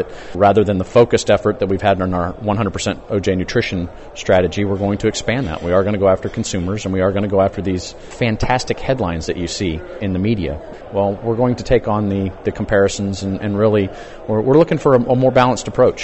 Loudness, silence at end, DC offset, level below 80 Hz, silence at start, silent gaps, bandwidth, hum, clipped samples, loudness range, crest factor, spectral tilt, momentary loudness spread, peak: -17 LUFS; 0 s; under 0.1%; -36 dBFS; 0 s; none; 8.4 kHz; none; under 0.1%; 4 LU; 16 dB; -6 dB/octave; 9 LU; -2 dBFS